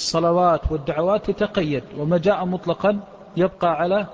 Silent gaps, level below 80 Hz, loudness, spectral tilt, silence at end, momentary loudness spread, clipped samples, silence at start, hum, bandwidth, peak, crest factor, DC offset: none; -40 dBFS; -21 LUFS; -6 dB/octave; 0 s; 7 LU; under 0.1%; 0 s; none; 8 kHz; -6 dBFS; 14 dB; under 0.1%